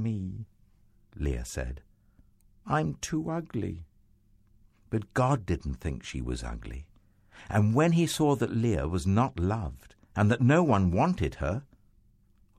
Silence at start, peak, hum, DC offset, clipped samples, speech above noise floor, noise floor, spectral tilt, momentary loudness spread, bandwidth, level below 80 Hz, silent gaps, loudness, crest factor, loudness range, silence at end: 0 s; -10 dBFS; none; under 0.1%; under 0.1%; 35 dB; -62 dBFS; -6.5 dB/octave; 15 LU; 14.5 kHz; -44 dBFS; none; -29 LUFS; 20 dB; 8 LU; 0.95 s